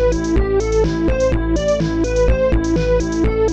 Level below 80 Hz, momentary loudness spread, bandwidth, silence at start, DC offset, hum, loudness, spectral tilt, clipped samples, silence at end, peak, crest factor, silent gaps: -22 dBFS; 2 LU; 8.4 kHz; 0 s; under 0.1%; none; -17 LUFS; -6.5 dB/octave; under 0.1%; 0 s; -6 dBFS; 10 dB; none